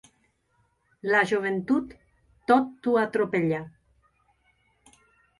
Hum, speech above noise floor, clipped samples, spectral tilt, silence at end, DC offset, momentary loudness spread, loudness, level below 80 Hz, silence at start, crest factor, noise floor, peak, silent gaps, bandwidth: none; 45 dB; under 0.1%; -6.5 dB/octave; 1.7 s; under 0.1%; 14 LU; -25 LUFS; -64 dBFS; 1.05 s; 20 dB; -70 dBFS; -8 dBFS; none; 11.5 kHz